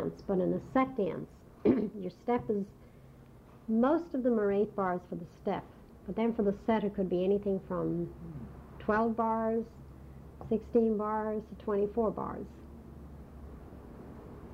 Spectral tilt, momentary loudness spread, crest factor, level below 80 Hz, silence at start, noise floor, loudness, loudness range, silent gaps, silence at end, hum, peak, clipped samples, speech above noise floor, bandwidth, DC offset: -9 dB/octave; 20 LU; 18 dB; -56 dBFS; 0 s; -54 dBFS; -32 LUFS; 2 LU; none; 0 s; none; -14 dBFS; under 0.1%; 23 dB; 6.8 kHz; under 0.1%